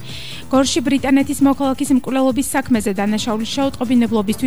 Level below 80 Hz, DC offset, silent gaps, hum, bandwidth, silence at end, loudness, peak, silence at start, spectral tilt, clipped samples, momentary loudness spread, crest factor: -44 dBFS; 2%; none; none; over 20 kHz; 0 s; -17 LUFS; -4 dBFS; 0 s; -4.5 dB/octave; under 0.1%; 4 LU; 12 dB